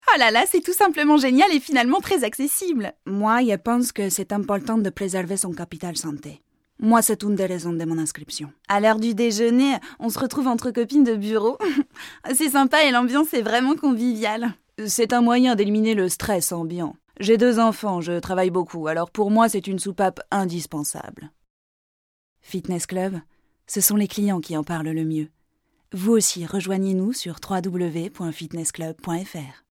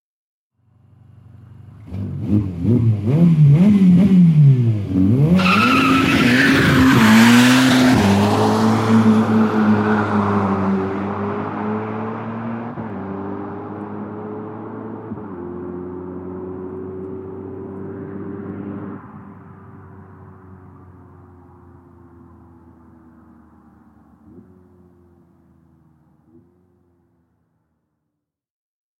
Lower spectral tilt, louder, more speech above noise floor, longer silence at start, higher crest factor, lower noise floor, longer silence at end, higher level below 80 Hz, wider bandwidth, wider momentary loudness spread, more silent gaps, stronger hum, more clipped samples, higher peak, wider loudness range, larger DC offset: second, -4 dB/octave vs -6.5 dB/octave; second, -21 LUFS vs -15 LUFS; second, 47 dB vs 67 dB; second, 0.05 s vs 1.65 s; about the same, 20 dB vs 18 dB; second, -68 dBFS vs -79 dBFS; second, 0.2 s vs 4.6 s; second, -58 dBFS vs -46 dBFS; about the same, 17.5 kHz vs 16 kHz; second, 12 LU vs 20 LU; first, 21.50-22.36 s vs none; neither; neither; about the same, -2 dBFS vs 0 dBFS; second, 6 LU vs 19 LU; neither